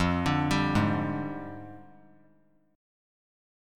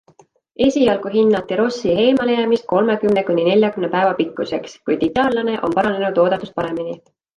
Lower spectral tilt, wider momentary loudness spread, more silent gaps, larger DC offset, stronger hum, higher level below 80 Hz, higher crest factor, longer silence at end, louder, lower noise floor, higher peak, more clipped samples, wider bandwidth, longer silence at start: about the same, -6.5 dB/octave vs -6 dB/octave; first, 17 LU vs 9 LU; neither; neither; neither; about the same, -48 dBFS vs -52 dBFS; about the same, 18 dB vs 14 dB; first, 1.9 s vs 0.4 s; second, -28 LUFS vs -18 LUFS; first, -65 dBFS vs -53 dBFS; second, -12 dBFS vs -4 dBFS; neither; first, 16.5 kHz vs 10 kHz; second, 0 s vs 0.6 s